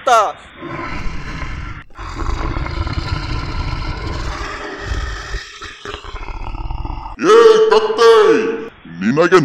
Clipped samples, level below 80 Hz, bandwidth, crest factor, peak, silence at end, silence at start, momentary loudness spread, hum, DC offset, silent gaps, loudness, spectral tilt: under 0.1%; -28 dBFS; 11.5 kHz; 16 dB; 0 dBFS; 0 s; 0 s; 21 LU; none; under 0.1%; none; -15 LUFS; -5.5 dB/octave